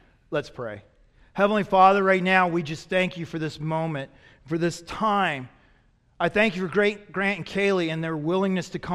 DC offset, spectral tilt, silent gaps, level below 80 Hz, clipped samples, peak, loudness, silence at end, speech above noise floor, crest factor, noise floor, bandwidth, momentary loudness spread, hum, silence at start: under 0.1%; -6 dB/octave; none; -56 dBFS; under 0.1%; -4 dBFS; -24 LUFS; 0 s; 37 dB; 20 dB; -61 dBFS; 12 kHz; 13 LU; none; 0.3 s